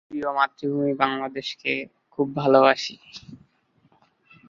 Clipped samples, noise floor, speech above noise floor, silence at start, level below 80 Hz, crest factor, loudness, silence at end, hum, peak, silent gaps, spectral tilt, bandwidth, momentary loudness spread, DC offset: under 0.1%; -63 dBFS; 40 dB; 0.1 s; -68 dBFS; 22 dB; -23 LUFS; 1.15 s; none; -2 dBFS; none; -5.5 dB/octave; 7.6 kHz; 20 LU; under 0.1%